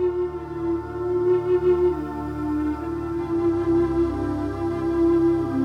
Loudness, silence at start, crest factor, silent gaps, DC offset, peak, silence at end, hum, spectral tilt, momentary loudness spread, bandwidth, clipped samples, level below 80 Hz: -23 LUFS; 0 s; 12 dB; none; under 0.1%; -10 dBFS; 0 s; none; -9 dB/octave; 8 LU; 5.8 kHz; under 0.1%; -40 dBFS